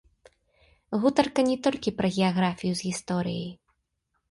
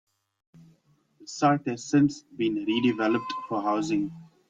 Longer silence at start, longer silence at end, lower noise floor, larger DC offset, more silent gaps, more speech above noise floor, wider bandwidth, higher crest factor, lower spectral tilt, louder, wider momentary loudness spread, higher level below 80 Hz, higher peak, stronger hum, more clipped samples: second, 0.9 s vs 1.2 s; first, 0.8 s vs 0.25 s; first, -77 dBFS vs -65 dBFS; neither; neither; first, 51 dB vs 39 dB; first, 11.5 kHz vs 7.8 kHz; about the same, 20 dB vs 18 dB; about the same, -5.5 dB/octave vs -5.5 dB/octave; about the same, -26 LUFS vs -26 LUFS; about the same, 9 LU vs 7 LU; first, -60 dBFS vs -66 dBFS; about the same, -8 dBFS vs -10 dBFS; neither; neither